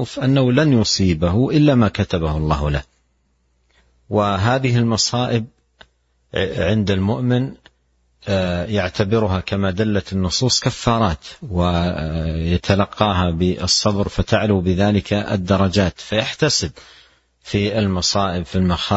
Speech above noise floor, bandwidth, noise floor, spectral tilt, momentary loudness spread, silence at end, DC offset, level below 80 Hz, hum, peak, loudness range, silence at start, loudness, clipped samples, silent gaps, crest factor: 46 dB; 8.4 kHz; -63 dBFS; -5 dB/octave; 7 LU; 0 s; under 0.1%; -36 dBFS; none; 0 dBFS; 3 LU; 0 s; -18 LUFS; under 0.1%; none; 18 dB